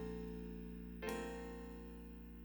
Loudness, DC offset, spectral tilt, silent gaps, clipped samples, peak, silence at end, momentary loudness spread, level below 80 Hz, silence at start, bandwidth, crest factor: -49 LUFS; under 0.1%; -6 dB/octave; none; under 0.1%; -30 dBFS; 0 s; 9 LU; -56 dBFS; 0 s; over 20 kHz; 18 dB